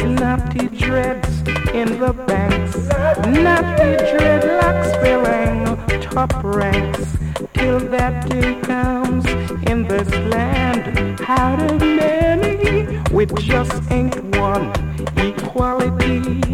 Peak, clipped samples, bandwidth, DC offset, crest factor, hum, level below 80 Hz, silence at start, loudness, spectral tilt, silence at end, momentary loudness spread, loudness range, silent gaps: -2 dBFS; under 0.1%; 16 kHz; under 0.1%; 14 dB; none; -26 dBFS; 0 s; -17 LUFS; -6.5 dB/octave; 0 s; 6 LU; 4 LU; none